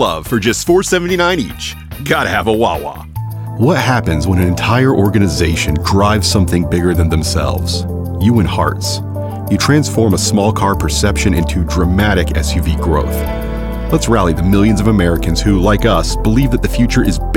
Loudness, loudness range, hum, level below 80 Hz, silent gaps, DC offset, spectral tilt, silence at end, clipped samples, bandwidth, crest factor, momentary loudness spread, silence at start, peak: -14 LUFS; 2 LU; none; -22 dBFS; none; under 0.1%; -5.5 dB/octave; 0 s; under 0.1%; 17 kHz; 12 dB; 8 LU; 0 s; 0 dBFS